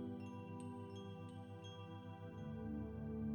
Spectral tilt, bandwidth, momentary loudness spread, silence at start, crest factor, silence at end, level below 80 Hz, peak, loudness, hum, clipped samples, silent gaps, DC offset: -7.5 dB/octave; 17.5 kHz; 6 LU; 0 s; 12 dB; 0 s; -62 dBFS; -36 dBFS; -50 LUFS; none; under 0.1%; none; under 0.1%